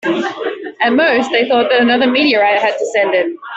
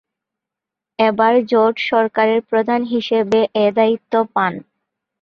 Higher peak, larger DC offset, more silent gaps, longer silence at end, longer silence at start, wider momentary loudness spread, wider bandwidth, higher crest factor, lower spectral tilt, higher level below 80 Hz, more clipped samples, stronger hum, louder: about the same, -2 dBFS vs -2 dBFS; neither; neither; second, 0 s vs 0.6 s; second, 0.05 s vs 1 s; about the same, 7 LU vs 5 LU; first, 8.2 kHz vs 7 kHz; about the same, 12 dB vs 16 dB; second, -4 dB/octave vs -6.5 dB/octave; about the same, -60 dBFS vs -62 dBFS; neither; neither; first, -13 LUFS vs -16 LUFS